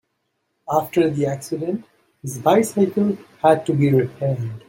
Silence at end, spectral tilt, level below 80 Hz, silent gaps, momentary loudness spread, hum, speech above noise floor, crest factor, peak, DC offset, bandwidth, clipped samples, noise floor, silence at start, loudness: 0.1 s; -7 dB/octave; -62 dBFS; none; 9 LU; none; 53 dB; 18 dB; -2 dBFS; under 0.1%; 16.5 kHz; under 0.1%; -73 dBFS; 0.7 s; -20 LUFS